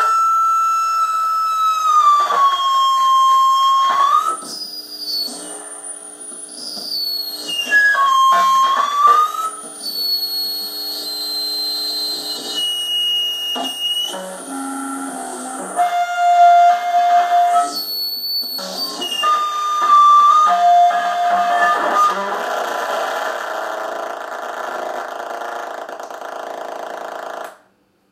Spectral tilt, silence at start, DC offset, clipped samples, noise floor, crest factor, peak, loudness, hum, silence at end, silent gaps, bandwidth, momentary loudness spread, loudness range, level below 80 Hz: 0 dB/octave; 0 s; under 0.1%; under 0.1%; -58 dBFS; 16 dB; -2 dBFS; -16 LUFS; none; 0.55 s; none; 16 kHz; 16 LU; 10 LU; -80 dBFS